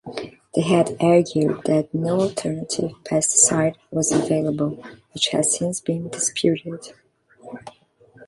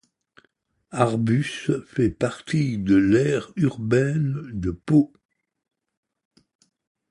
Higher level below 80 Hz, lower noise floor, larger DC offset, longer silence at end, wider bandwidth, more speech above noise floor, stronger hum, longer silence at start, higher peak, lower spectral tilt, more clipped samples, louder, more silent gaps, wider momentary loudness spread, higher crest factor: second, -60 dBFS vs -50 dBFS; second, -53 dBFS vs -68 dBFS; neither; second, 0.05 s vs 2.05 s; about the same, 11.5 kHz vs 11 kHz; second, 33 dB vs 46 dB; neither; second, 0.05 s vs 0.9 s; about the same, 0 dBFS vs -2 dBFS; second, -4 dB/octave vs -7.5 dB/octave; neither; first, -20 LUFS vs -23 LUFS; neither; first, 18 LU vs 9 LU; about the same, 22 dB vs 22 dB